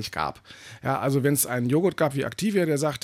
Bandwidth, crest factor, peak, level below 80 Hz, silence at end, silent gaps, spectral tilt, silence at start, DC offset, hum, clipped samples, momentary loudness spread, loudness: 16 kHz; 14 dB; -10 dBFS; -60 dBFS; 0.05 s; none; -5 dB/octave; 0 s; under 0.1%; none; under 0.1%; 10 LU; -25 LUFS